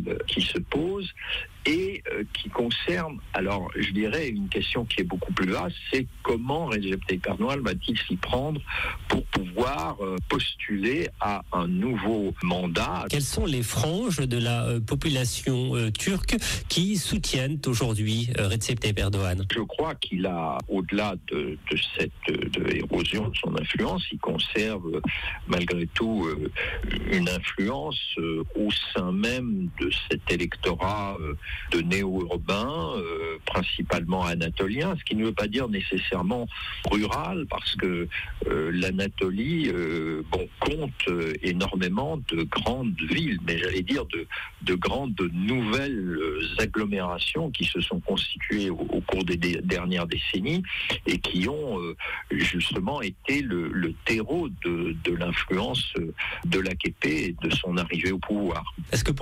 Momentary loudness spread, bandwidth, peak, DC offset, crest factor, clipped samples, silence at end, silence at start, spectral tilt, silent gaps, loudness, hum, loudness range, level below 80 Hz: 4 LU; 16 kHz; -12 dBFS; under 0.1%; 14 dB; under 0.1%; 0 s; 0 s; -5 dB/octave; none; -27 LUFS; none; 2 LU; -42 dBFS